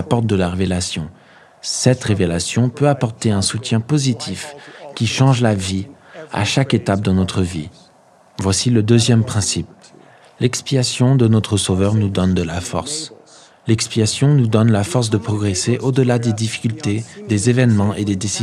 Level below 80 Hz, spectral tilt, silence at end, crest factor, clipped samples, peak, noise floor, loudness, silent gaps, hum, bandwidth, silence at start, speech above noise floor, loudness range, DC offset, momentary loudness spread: -48 dBFS; -5.5 dB/octave; 0 s; 18 dB; under 0.1%; 0 dBFS; -50 dBFS; -17 LUFS; none; none; 12.5 kHz; 0 s; 34 dB; 2 LU; under 0.1%; 12 LU